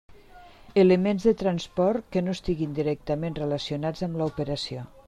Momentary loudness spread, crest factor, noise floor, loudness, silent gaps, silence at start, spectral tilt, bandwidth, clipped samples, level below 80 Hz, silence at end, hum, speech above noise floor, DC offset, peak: 10 LU; 18 dB; -49 dBFS; -26 LUFS; none; 0.1 s; -7 dB/octave; 10 kHz; under 0.1%; -48 dBFS; 0.05 s; none; 24 dB; under 0.1%; -8 dBFS